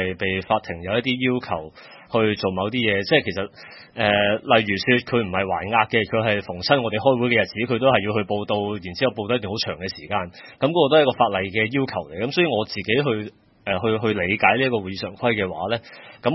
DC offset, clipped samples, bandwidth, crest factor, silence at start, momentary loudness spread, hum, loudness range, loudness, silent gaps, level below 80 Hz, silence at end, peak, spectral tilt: under 0.1%; under 0.1%; 6 kHz; 22 dB; 0 s; 9 LU; none; 3 LU; -21 LUFS; none; -58 dBFS; 0 s; 0 dBFS; -6.5 dB/octave